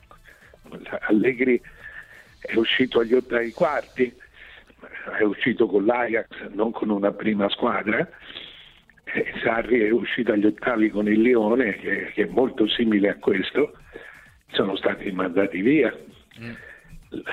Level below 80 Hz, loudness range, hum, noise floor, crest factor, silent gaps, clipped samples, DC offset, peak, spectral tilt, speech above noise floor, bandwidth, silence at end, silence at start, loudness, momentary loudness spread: -54 dBFS; 4 LU; none; -51 dBFS; 16 dB; none; under 0.1%; under 0.1%; -8 dBFS; -7 dB/octave; 29 dB; 7.8 kHz; 0 s; 0.7 s; -22 LUFS; 19 LU